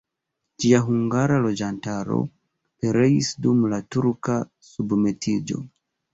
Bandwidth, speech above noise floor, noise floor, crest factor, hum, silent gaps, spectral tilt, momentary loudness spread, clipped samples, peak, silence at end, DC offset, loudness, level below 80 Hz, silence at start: 8 kHz; 59 dB; -81 dBFS; 18 dB; none; none; -6.5 dB/octave; 12 LU; under 0.1%; -4 dBFS; 0.45 s; under 0.1%; -23 LUFS; -56 dBFS; 0.6 s